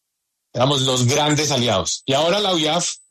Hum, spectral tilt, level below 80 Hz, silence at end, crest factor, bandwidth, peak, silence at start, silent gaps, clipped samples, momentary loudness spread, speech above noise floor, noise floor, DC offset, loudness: none; -3.5 dB/octave; -54 dBFS; 0.15 s; 14 dB; 13.5 kHz; -6 dBFS; 0.55 s; none; under 0.1%; 4 LU; 58 dB; -77 dBFS; under 0.1%; -18 LUFS